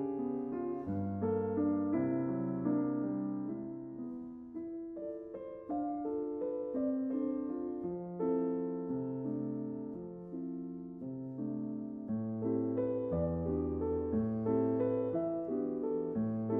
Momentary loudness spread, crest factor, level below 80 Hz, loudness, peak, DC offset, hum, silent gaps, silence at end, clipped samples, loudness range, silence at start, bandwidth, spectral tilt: 11 LU; 14 dB; -64 dBFS; -37 LUFS; -20 dBFS; under 0.1%; none; none; 0 s; under 0.1%; 6 LU; 0 s; 3.2 kHz; -11.5 dB/octave